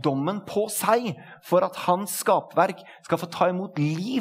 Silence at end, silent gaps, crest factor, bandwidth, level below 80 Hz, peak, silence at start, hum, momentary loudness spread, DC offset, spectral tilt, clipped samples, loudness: 0 s; none; 20 dB; 16 kHz; -74 dBFS; -6 dBFS; 0 s; none; 6 LU; under 0.1%; -5 dB/octave; under 0.1%; -25 LUFS